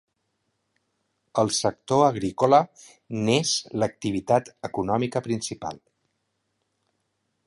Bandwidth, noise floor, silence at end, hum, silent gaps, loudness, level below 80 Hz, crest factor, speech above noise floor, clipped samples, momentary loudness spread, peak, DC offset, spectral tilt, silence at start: 11.5 kHz; -76 dBFS; 1.7 s; none; none; -24 LUFS; -58 dBFS; 22 dB; 52 dB; under 0.1%; 13 LU; -4 dBFS; under 0.1%; -4.5 dB/octave; 1.35 s